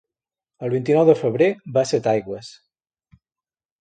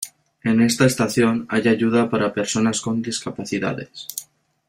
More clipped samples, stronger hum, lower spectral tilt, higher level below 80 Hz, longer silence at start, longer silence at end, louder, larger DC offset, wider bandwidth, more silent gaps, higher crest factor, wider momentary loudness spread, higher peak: neither; neither; first, -6.5 dB/octave vs -4.5 dB/octave; second, -64 dBFS vs -56 dBFS; first, 0.6 s vs 0 s; first, 1.3 s vs 0.45 s; about the same, -19 LUFS vs -20 LUFS; neither; second, 9.2 kHz vs 16 kHz; neither; about the same, 20 dB vs 20 dB; about the same, 15 LU vs 13 LU; about the same, -2 dBFS vs -2 dBFS